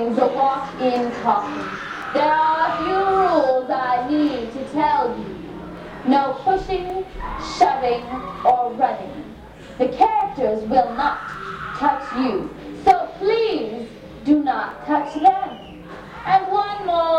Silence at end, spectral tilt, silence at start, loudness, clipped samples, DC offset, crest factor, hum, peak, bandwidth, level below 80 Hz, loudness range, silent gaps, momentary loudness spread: 0 s; -6 dB/octave; 0 s; -20 LUFS; under 0.1%; under 0.1%; 20 dB; none; -2 dBFS; 9.8 kHz; -46 dBFS; 3 LU; none; 14 LU